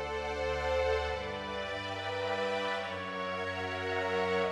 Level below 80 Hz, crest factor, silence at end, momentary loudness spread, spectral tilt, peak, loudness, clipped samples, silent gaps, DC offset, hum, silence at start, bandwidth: -50 dBFS; 14 dB; 0 s; 6 LU; -4.5 dB/octave; -20 dBFS; -34 LUFS; under 0.1%; none; under 0.1%; none; 0 s; 12.5 kHz